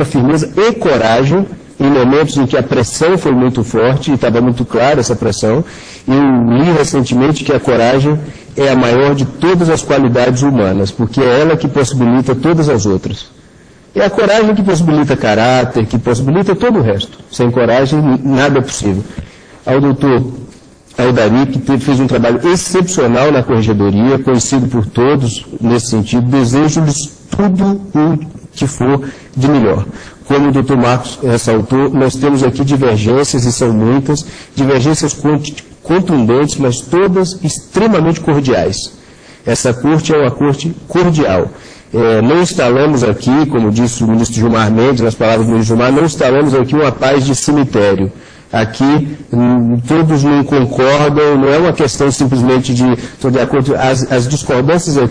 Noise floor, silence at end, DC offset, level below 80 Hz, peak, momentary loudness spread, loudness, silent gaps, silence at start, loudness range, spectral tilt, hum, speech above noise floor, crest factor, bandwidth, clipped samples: -41 dBFS; 0 s; under 0.1%; -38 dBFS; 0 dBFS; 6 LU; -11 LUFS; none; 0 s; 2 LU; -6 dB/octave; none; 30 dB; 10 dB; 10.5 kHz; under 0.1%